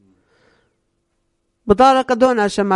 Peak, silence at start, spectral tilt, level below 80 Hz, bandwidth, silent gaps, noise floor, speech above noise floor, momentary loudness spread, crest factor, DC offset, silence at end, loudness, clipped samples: 0 dBFS; 1.65 s; -5 dB/octave; -44 dBFS; 11.5 kHz; none; -68 dBFS; 55 dB; 7 LU; 18 dB; under 0.1%; 0 s; -14 LUFS; under 0.1%